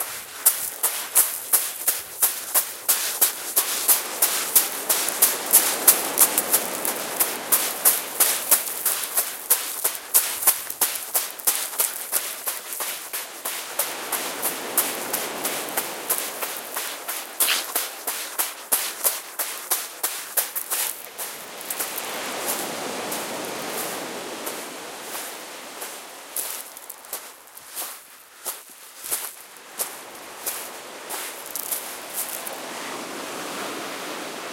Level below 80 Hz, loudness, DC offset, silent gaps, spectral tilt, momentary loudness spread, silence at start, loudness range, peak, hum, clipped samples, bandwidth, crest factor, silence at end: -74 dBFS; -23 LUFS; under 0.1%; none; 1 dB/octave; 15 LU; 0 s; 14 LU; 0 dBFS; none; under 0.1%; 17 kHz; 26 dB; 0 s